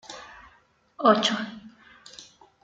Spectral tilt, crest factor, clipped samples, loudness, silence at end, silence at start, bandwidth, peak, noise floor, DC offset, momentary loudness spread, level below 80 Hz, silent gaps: -3.5 dB/octave; 22 dB; under 0.1%; -23 LUFS; 0.4 s; 0.1 s; 9.2 kHz; -6 dBFS; -61 dBFS; under 0.1%; 26 LU; -68 dBFS; none